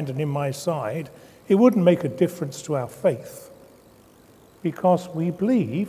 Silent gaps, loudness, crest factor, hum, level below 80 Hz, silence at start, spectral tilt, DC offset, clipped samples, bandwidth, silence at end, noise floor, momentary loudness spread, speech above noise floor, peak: none; -23 LUFS; 20 dB; none; -64 dBFS; 0 s; -7.5 dB/octave; under 0.1%; under 0.1%; 16 kHz; 0 s; -52 dBFS; 15 LU; 30 dB; -4 dBFS